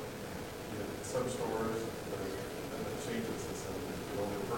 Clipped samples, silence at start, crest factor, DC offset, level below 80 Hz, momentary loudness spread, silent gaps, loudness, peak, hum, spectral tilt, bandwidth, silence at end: under 0.1%; 0 s; 14 dB; under 0.1%; -58 dBFS; 6 LU; none; -39 LUFS; -24 dBFS; none; -5 dB/octave; 17 kHz; 0 s